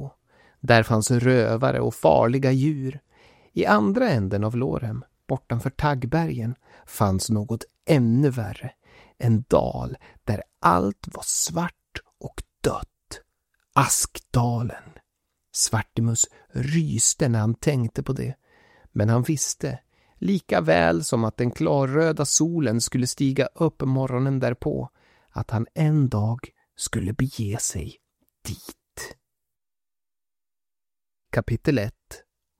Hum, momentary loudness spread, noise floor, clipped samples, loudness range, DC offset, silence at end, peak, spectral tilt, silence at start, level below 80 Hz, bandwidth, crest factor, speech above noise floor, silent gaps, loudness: none; 18 LU; under -90 dBFS; under 0.1%; 9 LU; under 0.1%; 0.4 s; -2 dBFS; -5 dB/octave; 0 s; -48 dBFS; 16.5 kHz; 22 dB; over 67 dB; none; -23 LUFS